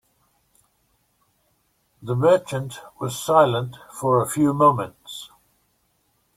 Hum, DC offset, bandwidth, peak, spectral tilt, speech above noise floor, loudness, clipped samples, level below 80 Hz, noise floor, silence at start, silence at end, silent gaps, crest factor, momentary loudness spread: none; under 0.1%; 16.5 kHz; -2 dBFS; -6 dB/octave; 47 dB; -21 LUFS; under 0.1%; -62 dBFS; -67 dBFS; 2 s; 1.1 s; none; 20 dB; 19 LU